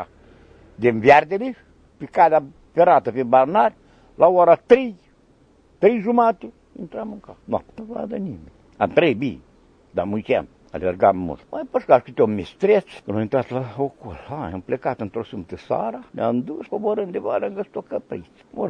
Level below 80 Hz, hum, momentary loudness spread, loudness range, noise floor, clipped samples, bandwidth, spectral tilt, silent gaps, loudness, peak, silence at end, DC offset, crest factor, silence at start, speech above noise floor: -54 dBFS; none; 18 LU; 8 LU; -55 dBFS; under 0.1%; 7.2 kHz; -8 dB/octave; none; -20 LUFS; 0 dBFS; 0 s; under 0.1%; 20 dB; 0 s; 35 dB